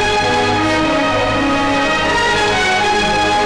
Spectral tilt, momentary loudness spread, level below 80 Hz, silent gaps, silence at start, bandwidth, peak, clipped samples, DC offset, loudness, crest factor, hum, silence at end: -3.5 dB/octave; 2 LU; -34 dBFS; none; 0 s; 11 kHz; -10 dBFS; under 0.1%; under 0.1%; -14 LUFS; 4 dB; none; 0 s